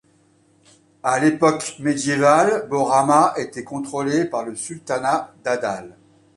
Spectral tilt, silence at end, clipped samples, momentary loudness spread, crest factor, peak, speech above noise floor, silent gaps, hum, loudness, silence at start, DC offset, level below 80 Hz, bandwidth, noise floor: -5 dB/octave; 0.45 s; under 0.1%; 13 LU; 18 dB; -2 dBFS; 38 dB; none; none; -20 LUFS; 1.05 s; under 0.1%; -62 dBFS; 11.5 kHz; -58 dBFS